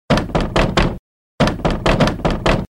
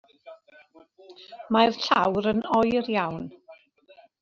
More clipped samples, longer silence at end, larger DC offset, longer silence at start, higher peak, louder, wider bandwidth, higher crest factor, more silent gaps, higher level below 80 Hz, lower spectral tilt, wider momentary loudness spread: neither; second, 0.1 s vs 0.65 s; neither; second, 0.1 s vs 0.25 s; about the same, -4 dBFS vs -6 dBFS; first, -17 LUFS vs -24 LUFS; first, 13.5 kHz vs 7.2 kHz; second, 14 dB vs 20 dB; first, 0.99-1.38 s vs none; first, -24 dBFS vs -60 dBFS; about the same, -6 dB/octave vs -5.5 dB/octave; second, 3 LU vs 19 LU